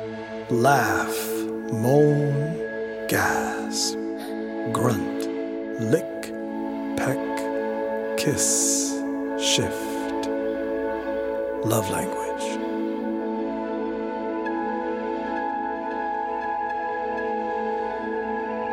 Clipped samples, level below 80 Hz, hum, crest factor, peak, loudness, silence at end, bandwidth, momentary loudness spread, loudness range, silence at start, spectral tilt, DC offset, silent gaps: under 0.1%; -56 dBFS; none; 20 dB; -4 dBFS; -25 LUFS; 0 s; 16.5 kHz; 9 LU; 4 LU; 0 s; -4 dB/octave; under 0.1%; none